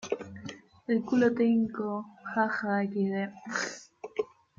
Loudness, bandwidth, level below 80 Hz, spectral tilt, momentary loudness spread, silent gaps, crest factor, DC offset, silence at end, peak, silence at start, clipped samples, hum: -30 LUFS; 7.6 kHz; -72 dBFS; -5.5 dB/octave; 17 LU; none; 18 dB; under 0.1%; 0.35 s; -14 dBFS; 0 s; under 0.1%; none